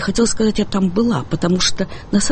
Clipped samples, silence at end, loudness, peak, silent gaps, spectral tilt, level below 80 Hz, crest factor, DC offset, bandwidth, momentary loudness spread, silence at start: under 0.1%; 0 s; -18 LUFS; -4 dBFS; none; -4.5 dB/octave; -34 dBFS; 14 dB; under 0.1%; 9 kHz; 4 LU; 0 s